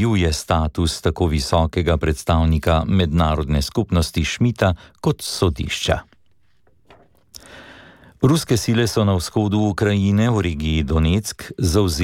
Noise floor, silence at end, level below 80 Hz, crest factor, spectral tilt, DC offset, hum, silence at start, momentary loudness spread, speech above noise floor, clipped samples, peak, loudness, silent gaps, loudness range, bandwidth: -64 dBFS; 0 s; -30 dBFS; 16 dB; -5.5 dB/octave; under 0.1%; none; 0 s; 5 LU; 46 dB; under 0.1%; -4 dBFS; -19 LUFS; none; 5 LU; 16.5 kHz